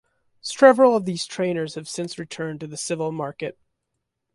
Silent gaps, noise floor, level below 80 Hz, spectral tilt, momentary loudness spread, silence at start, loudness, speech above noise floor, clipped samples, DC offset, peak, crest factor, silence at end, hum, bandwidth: none; -79 dBFS; -68 dBFS; -4.5 dB/octave; 17 LU; 0.45 s; -22 LUFS; 58 dB; under 0.1%; under 0.1%; -2 dBFS; 20 dB; 0.85 s; none; 11.5 kHz